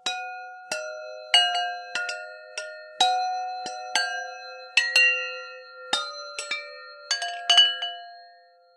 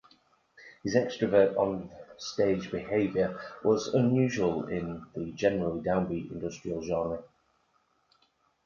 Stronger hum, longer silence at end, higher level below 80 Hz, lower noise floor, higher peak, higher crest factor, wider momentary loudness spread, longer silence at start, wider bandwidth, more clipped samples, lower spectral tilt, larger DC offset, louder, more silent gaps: neither; second, 0.45 s vs 1.4 s; second, -88 dBFS vs -58 dBFS; second, -55 dBFS vs -71 dBFS; first, -4 dBFS vs -10 dBFS; about the same, 24 dB vs 22 dB; first, 20 LU vs 13 LU; second, 0.05 s vs 0.6 s; first, 15 kHz vs 7.2 kHz; neither; second, 2.5 dB/octave vs -6.5 dB/octave; neither; first, -23 LUFS vs -29 LUFS; neither